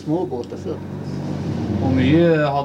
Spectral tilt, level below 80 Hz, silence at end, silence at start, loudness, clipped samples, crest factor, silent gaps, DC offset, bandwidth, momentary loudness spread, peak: -8 dB/octave; -50 dBFS; 0 s; 0 s; -20 LUFS; under 0.1%; 14 dB; none; under 0.1%; 9.2 kHz; 14 LU; -4 dBFS